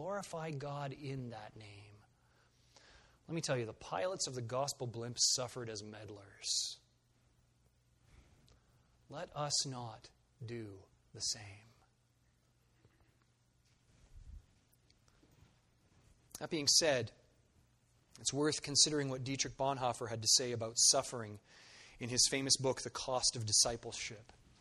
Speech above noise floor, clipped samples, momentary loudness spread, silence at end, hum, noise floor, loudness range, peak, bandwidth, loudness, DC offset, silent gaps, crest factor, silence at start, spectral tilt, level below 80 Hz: 37 dB; under 0.1%; 21 LU; 0.4 s; none; -74 dBFS; 14 LU; -14 dBFS; 13 kHz; -35 LUFS; under 0.1%; none; 26 dB; 0 s; -2 dB/octave; -68 dBFS